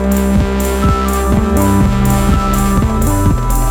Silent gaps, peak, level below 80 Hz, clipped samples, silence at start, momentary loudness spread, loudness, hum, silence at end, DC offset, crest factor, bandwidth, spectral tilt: none; 0 dBFS; -16 dBFS; under 0.1%; 0 s; 2 LU; -13 LUFS; none; 0 s; under 0.1%; 10 dB; 18.5 kHz; -6.5 dB/octave